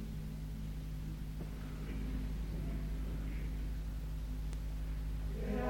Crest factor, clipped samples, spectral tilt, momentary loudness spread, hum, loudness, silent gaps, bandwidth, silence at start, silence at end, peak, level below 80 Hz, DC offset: 14 dB; under 0.1%; -7 dB/octave; 3 LU; none; -43 LUFS; none; 16.5 kHz; 0 s; 0 s; -24 dBFS; -40 dBFS; under 0.1%